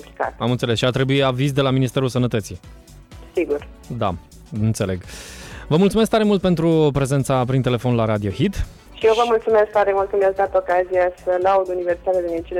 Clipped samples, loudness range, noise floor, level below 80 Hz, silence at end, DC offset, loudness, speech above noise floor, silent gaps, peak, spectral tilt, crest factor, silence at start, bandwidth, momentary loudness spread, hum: under 0.1%; 6 LU; -41 dBFS; -40 dBFS; 0 s; under 0.1%; -19 LUFS; 22 dB; none; -6 dBFS; -6.5 dB/octave; 12 dB; 0 s; 15 kHz; 12 LU; none